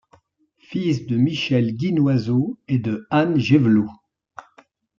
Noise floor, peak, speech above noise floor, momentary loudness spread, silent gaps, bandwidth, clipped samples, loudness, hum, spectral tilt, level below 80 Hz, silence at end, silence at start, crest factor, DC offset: -60 dBFS; -4 dBFS; 41 dB; 7 LU; none; 7.4 kHz; under 0.1%; -20 LUFS; none; -7.5 dB/octave; -60 dBFS; 1.05 s; 0.7 s; 18 dB; under 0.1%